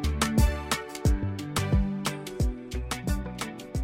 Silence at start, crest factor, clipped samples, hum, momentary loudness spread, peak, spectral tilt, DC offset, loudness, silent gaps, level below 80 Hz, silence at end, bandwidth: 0 s; 18 dB; under 0.1%; none; 9 LU; -10 dBFS; -5 dB/octave; under 0.1%; -29 LUFS; none; -32 dBFS; 0 s; 16.5 kHz